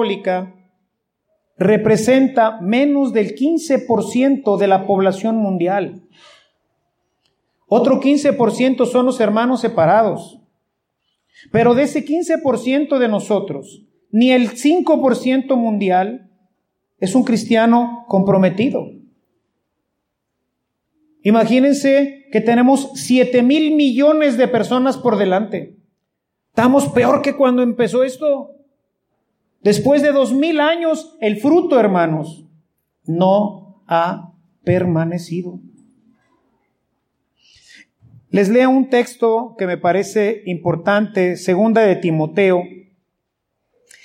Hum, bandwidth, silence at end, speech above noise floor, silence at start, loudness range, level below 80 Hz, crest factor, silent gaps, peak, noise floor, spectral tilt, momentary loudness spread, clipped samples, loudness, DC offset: none; 15 kHz; 1.3 s; 60 dB; 0 s; 5 LU; -62 dBFS; 14 dB; none; -2 dBFS; -75 dBFS; -6 dB/octave; 9 LU; under 0.1%; -16 LUFS; under 0.1%